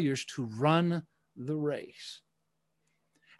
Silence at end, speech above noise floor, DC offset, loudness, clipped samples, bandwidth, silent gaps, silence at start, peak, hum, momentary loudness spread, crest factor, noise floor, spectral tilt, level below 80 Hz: 1.2 s; 50 dB; under 0.1%; -32 LUFS; under 0.1%; 12 kHz; none; 0 s; -12 dBFS; none; 19 LU; 22 dB; -81 dBFS; -6 dB/octave; -76 dBFS